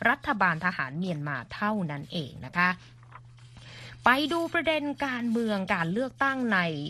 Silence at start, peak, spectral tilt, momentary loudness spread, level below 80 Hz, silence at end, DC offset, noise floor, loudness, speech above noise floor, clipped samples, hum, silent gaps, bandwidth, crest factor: 0 s; -6 dBFS; -6 dB/octave; 10 LU; -60 dBFS; 0 s; under 0.1%; -49 dBFS; -28 LUFS; 21 dB; under 0.1%; none; none; 13.5 kHz; 22 dB